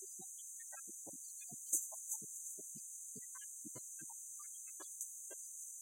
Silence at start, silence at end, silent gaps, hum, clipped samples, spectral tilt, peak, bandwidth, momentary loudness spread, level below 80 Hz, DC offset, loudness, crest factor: 0 s; 0 s; none; none; under 0.1%; -1 dB/octave; -20 dBFS; 16.5 kHz; 10 LU; under -90 dBFS; under 0.1%; -45 LUFS; 28 dB